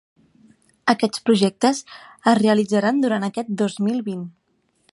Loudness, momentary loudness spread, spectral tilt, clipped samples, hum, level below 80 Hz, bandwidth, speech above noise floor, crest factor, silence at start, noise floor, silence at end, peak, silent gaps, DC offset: -20 LUFS; 12 LU; -5.5 dB/octave; under 0.1%; none; -68 dBFS; 11.5 kHz; 47 dB; 20 dB; 0.85 s; -66 dBFS; 0.6 s; -2 dBFS; none; under 0.1%